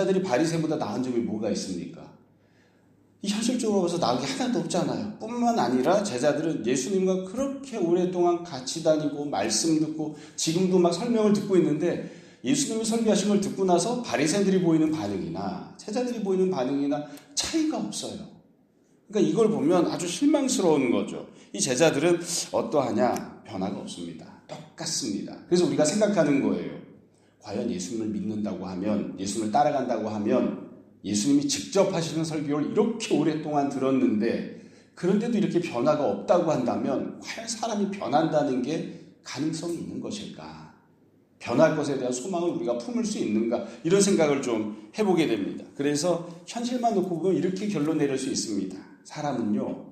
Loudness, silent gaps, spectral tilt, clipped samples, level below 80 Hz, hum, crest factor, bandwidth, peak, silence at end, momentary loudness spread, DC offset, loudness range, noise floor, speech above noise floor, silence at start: -26 LUFS; none; -5 dB/octave; under 0.1%; -66 dBFS; none; 20 dB; 15 kHz; -6 dBFS; 0 s; 12 LU; under 0.1%; 4 LU; -62 dBFS; 36 dB; 0 s